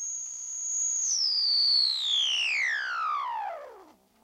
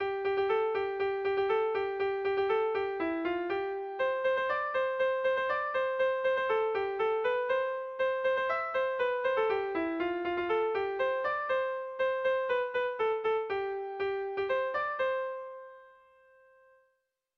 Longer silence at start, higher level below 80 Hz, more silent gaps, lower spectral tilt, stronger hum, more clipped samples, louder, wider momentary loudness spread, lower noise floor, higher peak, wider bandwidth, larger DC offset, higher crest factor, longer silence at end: about the same, 0 s vs 0 s; second, -80 dBFS vs -68 dBFS; neither; second, 5 dB/octave vs -5.5 dB/octave; neither; neither; first, -25 LUFS vs -31 LUFS; first, 13 LU vs 5 LU; second, -55 dBFS vs -78 dBFS; about the same, -16 dBFS vs -18 dBFS; first, 16 kHz vs 6.4 kHz; neither; about the same, 12 dB vs 12 dB; second, 0.4 s vs 1.5 s